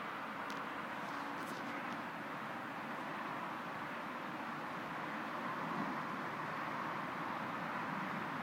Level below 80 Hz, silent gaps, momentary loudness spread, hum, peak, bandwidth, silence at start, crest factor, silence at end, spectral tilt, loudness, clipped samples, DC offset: -80 dBFS; none; 3 LU; none; -28 dBFS; 16 kHz; 0 s; 14 dB; 0 s; -5 dB/octave; -42 LUFS; under 0.1%; under 0.1%